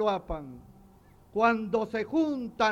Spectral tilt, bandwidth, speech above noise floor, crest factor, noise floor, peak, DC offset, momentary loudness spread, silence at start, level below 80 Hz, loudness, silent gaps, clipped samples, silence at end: -6 dB/octave; 8 kHz; 28 dB; 18 dB; -56 dBFS; -12 dBFS; under 0.1%; 13 LU; 0 s; -50 dBFS; -29 LUFS; none; under 0.1%; 0 s